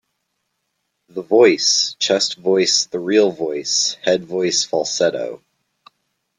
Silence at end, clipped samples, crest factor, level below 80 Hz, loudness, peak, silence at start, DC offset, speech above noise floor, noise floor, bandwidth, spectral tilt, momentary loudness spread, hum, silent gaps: 1.05 s; under 0.1%; 18 dB; -66 dBFS; -17 LUFS; -2 dBFS; 1.15 s; under 0.1%; 56 dB; -73 dBFS; 11 kHz; -2 dB/octave; 9 LU; none; none